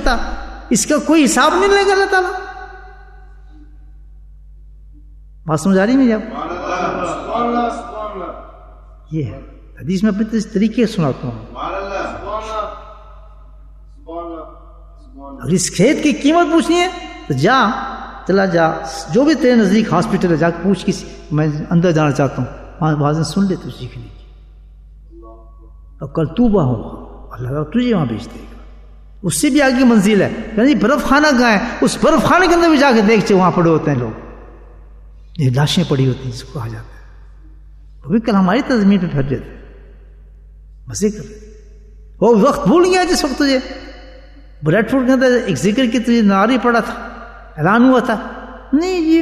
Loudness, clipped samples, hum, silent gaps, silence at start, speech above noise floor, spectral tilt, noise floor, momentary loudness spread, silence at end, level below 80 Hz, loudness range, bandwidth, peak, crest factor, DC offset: -15 LUFS; under 0.1%; none; none; 0 s; 25 dB; -5.5 dB/octave; -39 dBFS; 18 LU; 0 s; -36 dBFS; 9 LU; 13.5 kHz; 0 dBFS; 16 dB; under 0.1%